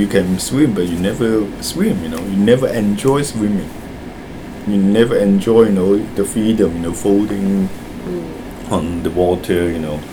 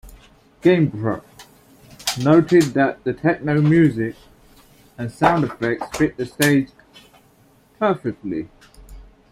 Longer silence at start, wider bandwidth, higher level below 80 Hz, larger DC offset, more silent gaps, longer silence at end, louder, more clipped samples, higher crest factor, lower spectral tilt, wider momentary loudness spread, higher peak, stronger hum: about the same, 0 s vs 0.05 s; first, 20 kHz vs 16.5 kHz; first, -38 dBFS vs -50 dBFS; neither; neither; second, 0 s vs 0.3 s; first, -16 LUFS vs -19 LUFS; neither; about the same, 16 dB vs 20 dB; about the same, -6 dB/octave vs -6 dB/octave; about the same, 14 LU vs 13 LU; about the same, 0 dBFS vs -2 dBFS; neither